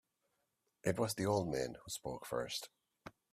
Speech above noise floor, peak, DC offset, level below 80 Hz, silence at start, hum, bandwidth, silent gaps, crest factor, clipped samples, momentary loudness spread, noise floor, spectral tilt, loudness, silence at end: 45 dB; -18 dBFS; under 0.1%; -68 dBFS; 0.85 s; none; 15.5 kHz; none; 22 dB; under 0.1%; 21 LU; -84 dBFS; -4.5 dB/octave; -39 LUFS; 0.2 s